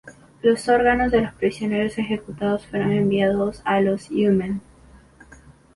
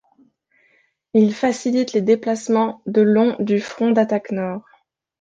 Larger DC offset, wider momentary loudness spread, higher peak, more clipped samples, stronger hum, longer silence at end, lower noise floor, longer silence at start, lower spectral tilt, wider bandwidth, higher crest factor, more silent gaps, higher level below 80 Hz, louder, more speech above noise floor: neither; about the same, 7 LU vs 7 LU; about the same, -4 dBFS vs -4 dBFS; neither; neither; first, 1.15 s vs 0.6 s; second, -49 dBFS vs -61 dBFS; second, 0.05 s vs 1.15 s; about the same, -6.5 dB/octave vs -6.5 dB/octave; first, 11.5 kHz vs 8.8 kHz; about the same, 18 dB vs 16 dB; neither; first, -46 dBFS vs -64 dBFS; about the same, -21 LUFS vs -19 LUFS; second, 29 dB vs 43 dB